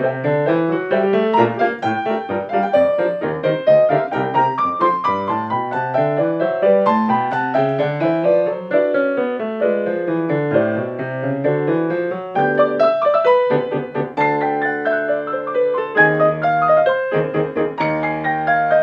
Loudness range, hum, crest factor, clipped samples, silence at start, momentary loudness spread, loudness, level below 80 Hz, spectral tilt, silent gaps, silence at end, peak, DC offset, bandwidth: 2 LU; none; 18 dB; under 0.1%; 0 s; 6 LU; -18 LUFS; -62 dBFS; -8.5 dB/octave; none; 0 s; 0 dBFS; under 0.1%; 6.4 kHz